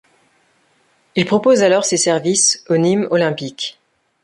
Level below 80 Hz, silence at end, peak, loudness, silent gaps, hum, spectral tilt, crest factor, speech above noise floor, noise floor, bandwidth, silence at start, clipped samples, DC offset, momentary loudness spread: -60 dBFS; 0.55 s; -2 dBFS; -15 LUFS; none; none; -3.5 dB/octave; 16 dB; 44 dB; -59 dBFS; 11.5 kHz; 1.15 s; under 0.1%; under 0.1%; 11 LU